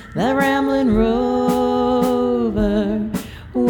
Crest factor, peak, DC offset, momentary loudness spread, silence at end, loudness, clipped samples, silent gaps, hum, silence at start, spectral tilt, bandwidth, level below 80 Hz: 14 dB; -4 dBFS; under 0.1%; 6 LU; 0 s; -18 LUFS; under 0.1%; none; none; 0 s; -6.5 dB/octave; 20 kHz; -34 dBFS